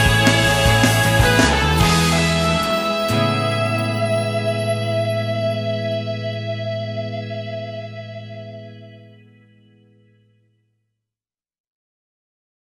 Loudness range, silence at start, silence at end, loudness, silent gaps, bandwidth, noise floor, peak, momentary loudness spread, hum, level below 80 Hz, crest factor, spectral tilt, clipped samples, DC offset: 18 LU; 0 s; 3.6 s; -18 LUFS; none; 17.5 kHz; under -90 dBFS; -4 dBFS; 17 LU; none; -34 dBFS; 16 dB; -4.5 dB/octave; under 0.1%; under 0.1%